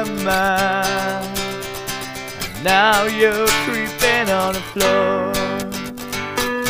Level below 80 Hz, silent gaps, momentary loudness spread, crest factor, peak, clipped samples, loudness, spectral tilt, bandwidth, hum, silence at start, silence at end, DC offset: -42 dBFS; none; 12 LU; 18 dB; -2 dBFS; under 0.1%; -18 LUFS; -3 dB/octave; 16 kHz; none; 0 s; 0 s; 0.1%